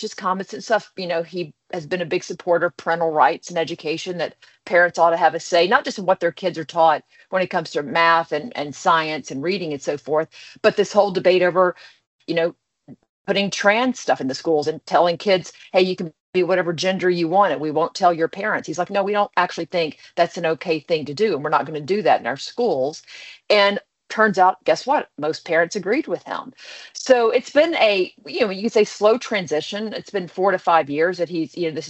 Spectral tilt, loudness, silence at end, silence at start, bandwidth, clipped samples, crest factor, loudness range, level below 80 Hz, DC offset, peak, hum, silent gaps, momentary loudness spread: -4.5 dB/octave; -20 LUFS; 0 s; 0 s; 8.2 kHz; under 0.1%; 20 dB; 3 LU; -70 dBFS; under 0.1%; 0 dBFS; none; 12.07-12.19 s, 13.09-13.25 s, 16.20-16.33 s; 10 LU